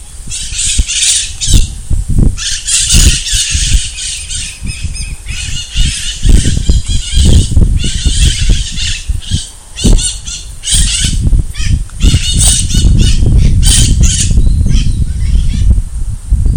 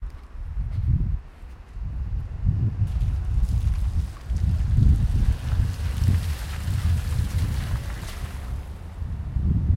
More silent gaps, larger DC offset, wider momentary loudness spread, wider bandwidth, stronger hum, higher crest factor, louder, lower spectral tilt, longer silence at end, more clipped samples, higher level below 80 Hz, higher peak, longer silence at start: neither; neither; about the same, 11 LU vs 12 LU; first, over 20 kHz vs 15.5 kHz; neither; second, 10 dB vs 16 dB; first, -11 LUFS vs -26 LUFS; second, -3 dB/octave vs -7 dB/octave; about the same, 0 s vs 0 s; first, 4% vs under 0.1%; first, -12 dBFS vs -26 dBFS; first, 0 dBFS vs -8 dBFS; about the same, 0 s vs 0 s